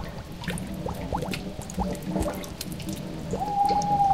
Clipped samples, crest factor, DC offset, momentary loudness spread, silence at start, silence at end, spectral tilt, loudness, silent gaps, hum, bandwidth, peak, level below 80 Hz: under 0.1%; 16 dB; 0.3%; 11 LU; 0 s; 0 s; -5.5 dB/octave; -30 LUFS; none; none; 16 kHz; -12 dBFS; -42 dBFS